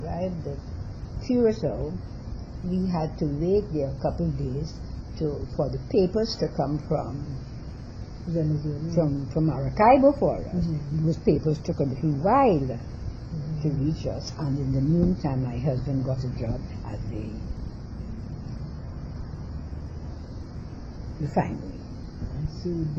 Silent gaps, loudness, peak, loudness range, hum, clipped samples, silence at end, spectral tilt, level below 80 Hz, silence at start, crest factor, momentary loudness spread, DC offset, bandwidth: none; -27 LUFS; -6 dBFS; 12 LU; none; under 0.1%; 0 s; -8.5 dB/octave; -38 dBFS; 0 s; 20 dB; 15 LU; under 0.1%; 7.4 kHz